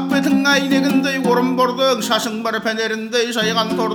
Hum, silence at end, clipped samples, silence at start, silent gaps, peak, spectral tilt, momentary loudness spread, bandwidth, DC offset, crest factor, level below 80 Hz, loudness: none; 0 s; under 0.1%; 0 s; none; -2 dBFS; -4 dB/octave; 5 LU; 19.5 kHz; under 0.1%; 14 dB; -62 dBFS; -17 LUFS